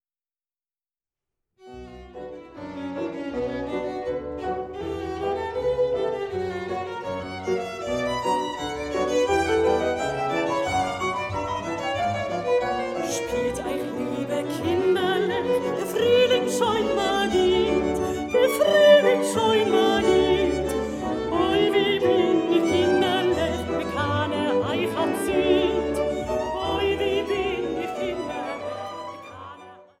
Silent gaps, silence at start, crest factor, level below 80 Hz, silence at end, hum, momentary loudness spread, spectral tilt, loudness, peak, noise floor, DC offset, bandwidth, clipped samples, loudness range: none; 1.65 s; 18 dB; -48 dBFS; 0.2 s; none; 11 LU; -4.5 dB/octave; -24 LUFS; -6 dBFS; under -90 dBFS; under 0.1%; 16 kHz; under 0.1%; 9 LU